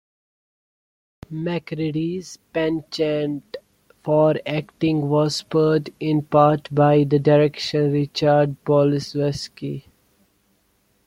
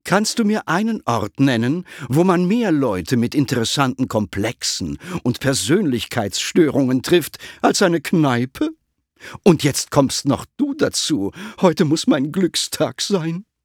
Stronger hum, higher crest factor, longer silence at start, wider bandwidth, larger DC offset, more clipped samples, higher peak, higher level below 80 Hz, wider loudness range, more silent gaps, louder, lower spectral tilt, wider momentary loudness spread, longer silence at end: neither; about the same, 18 dB vs 18 dB; first, 1.3 s vs 0.05 s; second, 12 kHz vs 19 kHz; neither; neither; about the same, -2 dBFS vs 0 dBFS; second, -58 dBFS vs -52 dBFS; first, 8 LU vs 2 LU; neither; about the same, -20 LUFS vs -19 LUFS; first, -7 dB/octave vs -5 dB/octave; first, 14 LU vs 7 LU; first, 1.25 s vs 0.25 s